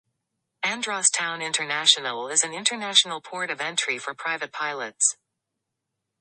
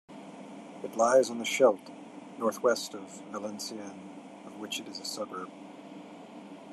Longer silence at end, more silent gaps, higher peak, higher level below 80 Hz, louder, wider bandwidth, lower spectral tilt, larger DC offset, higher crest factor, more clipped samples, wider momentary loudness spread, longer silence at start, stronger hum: first, 1.05 s vs 0 s; neither; first, -2 dBFS vs -10 dBFS; first, -82 dBFS vs under -90 dBFS; first, -23 LUFS vs -30 LUFS; second, 11.5 kHz vs 13.5 kHz; second, 1 dB/octave vs -3 dB/octave; neither; about the same, 26 dB vs 22 dB; neither; second, 10 LU vs 22 LU; first, 0.6 s vs 0.1 s; neither